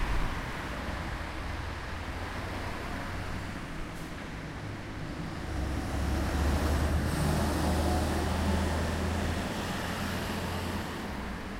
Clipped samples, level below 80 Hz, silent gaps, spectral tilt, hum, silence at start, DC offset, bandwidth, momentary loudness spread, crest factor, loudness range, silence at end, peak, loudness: under 0.1%; -36 dBFS; none; -5.5 dB/octave; none; 0 s; under 0.1%; 16 kHz; 10 LU; 16 dB; 8 LU; 0 s; -16 dBFS; -33 LUFS